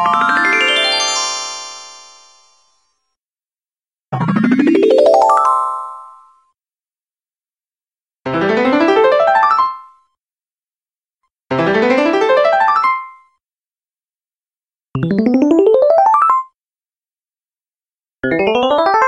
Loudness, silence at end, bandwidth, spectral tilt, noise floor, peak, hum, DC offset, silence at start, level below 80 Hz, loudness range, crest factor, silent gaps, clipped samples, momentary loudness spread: -13 LUFS; 0 s; 11.5 kHz; -4.5 dB/octave; under -90 dBFS; 0 dBFS; none; under 0.1%; 0 s; -56 dBFS; 6 LU; 16 dB; none; under 0.1%; 14 LU